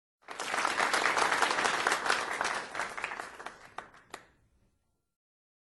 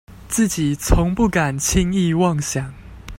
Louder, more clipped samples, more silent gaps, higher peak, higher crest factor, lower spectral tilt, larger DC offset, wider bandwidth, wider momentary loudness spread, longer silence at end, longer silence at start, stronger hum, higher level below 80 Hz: second, -30 LUFS vs -19 LUFS; neither; neither; second, -12 dBFS vs 0 dBFS; about the same, 22 dB vs 18 dB; second, -0.5 dB/octave vs -5 dB/octave; neither; second, 12 kHz vs 16.5 kHz; first, 21 LU vs 8 LU; first, 1.45 s vs 0 s; first, 0.3 s vs 0.1 s; neither; second, -70 dBFS vs -28 dBFS